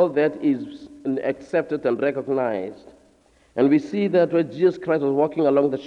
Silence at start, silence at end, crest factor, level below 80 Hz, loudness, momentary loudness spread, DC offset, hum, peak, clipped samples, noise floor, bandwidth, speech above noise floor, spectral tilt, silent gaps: 0 s; 0 s; 16 dB; -64 dBFS; -22 LUFS; 9 LU; under 0.1%; none; -6 dBFS; under 0.1%; -58 dBFS; 7.8 kHz; 36 dB; -8 dB/octave; none